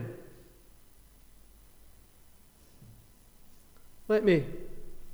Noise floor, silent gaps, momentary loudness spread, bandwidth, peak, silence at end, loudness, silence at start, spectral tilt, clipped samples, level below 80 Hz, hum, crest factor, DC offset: -57 dBFS; none; 28 LU; over 20 kHz; -14 dBFS; 0 s; -28 LUFS; 0 s; -7 dB/octave; under 0.1%; -52 dBFS; none; 22 dB; under 0.1%